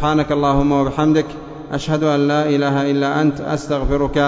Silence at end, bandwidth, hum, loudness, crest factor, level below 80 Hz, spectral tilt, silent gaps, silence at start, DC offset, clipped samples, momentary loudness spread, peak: 0 s; 7.8 kHz; none; -17 LUFS; 14 dB; -34 dBFS; -7 dB/octave; none; 0 s; under 0.1%; under 0.1%; 8 LU; -2 dBFS